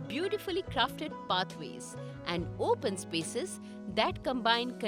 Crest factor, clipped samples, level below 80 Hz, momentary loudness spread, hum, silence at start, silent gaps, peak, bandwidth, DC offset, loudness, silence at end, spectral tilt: 22 dB; under 0.1%; -58 dBFS; 12 LU; none; 0 s; none; -12 dBFS; 19 kHz; under 0.1%; -33 LUFS; 0 s; -4 dB/octave